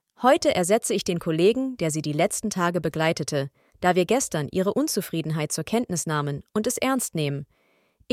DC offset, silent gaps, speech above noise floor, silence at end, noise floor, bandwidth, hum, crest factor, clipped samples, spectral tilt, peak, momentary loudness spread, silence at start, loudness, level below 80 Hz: under 0.1%; none; 40 dB; 0.7 s; -64 dBFS; 16.5 kHz; none; 20 dB; under 0.1%; -4.5 dB/octave; -4 dBFS; 7 LU; 0.2 s; -24 LUFS; -60 dBFS